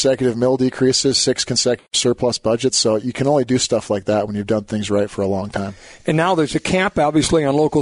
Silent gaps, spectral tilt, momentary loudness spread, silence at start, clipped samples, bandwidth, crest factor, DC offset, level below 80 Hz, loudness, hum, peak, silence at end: none; -4 dB/octave; 5 LU; 0 s; under 0.1%; 11 kHz; 12 dB; under 0.1%; -46 dBFS; -18 LUFS; none; -6 dBFS; 0 s